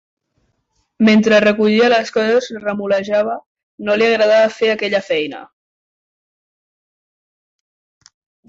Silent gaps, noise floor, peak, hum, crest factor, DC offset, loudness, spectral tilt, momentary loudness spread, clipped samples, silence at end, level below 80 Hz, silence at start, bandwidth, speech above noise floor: 3.46-3.55 s, 3.63-3.78 s; -66 dBFS; -2 dBFS; none; 16 dB; under 0.1%; -15 LUFS; -5 dB/octave; 11 LU; under 0.1%; 3.05 s; -62 dBFS; 1 s; 7.8 kHz; 52 dB